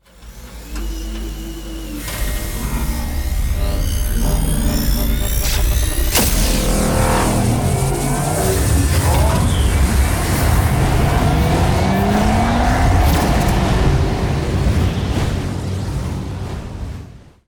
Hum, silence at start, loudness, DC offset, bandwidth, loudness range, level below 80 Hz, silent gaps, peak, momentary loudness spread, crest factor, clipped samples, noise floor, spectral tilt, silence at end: none; 0.2 s; -17 LUFS; under 0.1%; 19.5 kHz; 7 LU; -20 dBFS; none; -4 dBFS; 12 LU; 12 dB; under 0.1%; -37 dBFS; -5 dB/octave; 0.3 s